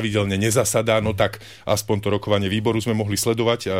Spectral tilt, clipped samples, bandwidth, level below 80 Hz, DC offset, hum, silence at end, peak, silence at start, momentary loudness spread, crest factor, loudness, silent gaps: -4.5 dB/octave; under 0.1%; 16 kHz; -48 dBFS; 0.2%; none; 0 s; -4 dBFS; 0 s; 5 LU; 16 dB; -21 LUFS; none